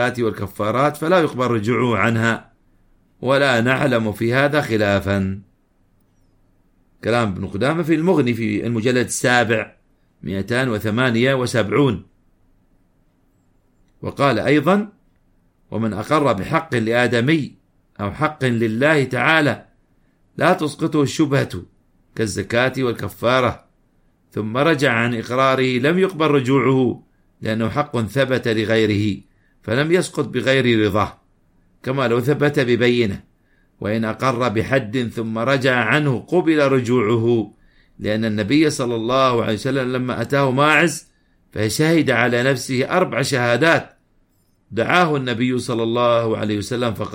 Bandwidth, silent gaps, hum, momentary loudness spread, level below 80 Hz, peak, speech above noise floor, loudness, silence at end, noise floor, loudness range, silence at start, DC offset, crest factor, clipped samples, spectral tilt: 16.5 kHz; none; none; 9 LU; -52 dBFS; -2 dBFS; 42 dB; -18 LUFS; 0 s; -60 dBFS; 4 LU; 0 s; under 0.1%; 18 dB; under 0.1%; -5.5 dB/octave